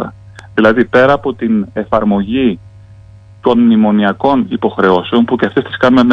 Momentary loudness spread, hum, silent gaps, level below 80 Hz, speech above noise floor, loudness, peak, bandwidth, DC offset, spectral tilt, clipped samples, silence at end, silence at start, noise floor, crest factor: 7 LU; none; none; -40 dBFS; 27 dB; -12 LUFS; 0 dBFS; 6.6 kHz; under 0.1%; -8 dB/octave; 0.3%; 0 s; 0 s; -38 dBFS; 12 dB